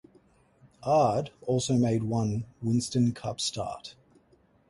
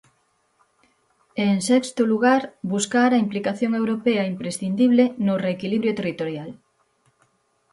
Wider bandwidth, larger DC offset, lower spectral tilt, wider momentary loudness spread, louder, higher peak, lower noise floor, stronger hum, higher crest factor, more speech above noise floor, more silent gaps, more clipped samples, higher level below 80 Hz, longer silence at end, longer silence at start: about the same, 11.5 kHz vs 11.5 kHz; neither; about the same, -6 dB/octave vs -5.5 dB/octave; first, 12 LU vs 9 LU; second, -28 LUFS vs -21 LUFS; second, -14 dBFS vs -6 dBFS; about the same, -64 dBFS vs -67 dBFS; neither; about the same, 16 dB vs 16 dB; second, 36 dB vs 46 dB; neither; neither; first, -58 dBFS vs -66 dBFS; second, 0.8 s vs 1.2 s; second, 0.8 s vs 1.35 s